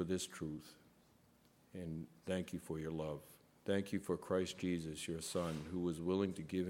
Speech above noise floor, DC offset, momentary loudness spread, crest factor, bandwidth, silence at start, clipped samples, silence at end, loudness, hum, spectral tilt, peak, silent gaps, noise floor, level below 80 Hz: 29 dB; under 0.1%; 12 LU; 18 dB; 17 kHz; 0 s; under 0.1%; 0 s; -42 LUFS; none; -5.5 dB/octave; -24 dBFS; none; -70 dBFS; -66 dBFS